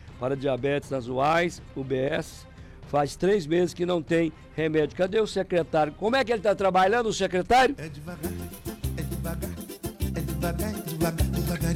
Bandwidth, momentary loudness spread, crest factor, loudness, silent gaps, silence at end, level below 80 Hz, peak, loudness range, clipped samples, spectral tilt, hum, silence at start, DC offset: 16.5 kHz; 13 LU; 12 dB; -26 LUFS; none; 0 s; -40 dBFS; -14 dBFS; 7 LU; under 0.1%; -5.5 dB/octave; none; 0 s; under 0.1%